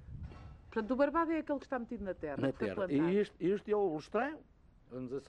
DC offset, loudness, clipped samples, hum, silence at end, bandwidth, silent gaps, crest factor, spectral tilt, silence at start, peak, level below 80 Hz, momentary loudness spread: under 0.1%; -35 LUFS; under 0.1%; none; 0.05 s; 9.4 kHz; none; 16 dB; -8 dB/octave; 0 s; -20 dBFS; -58 dBFS; 18 LU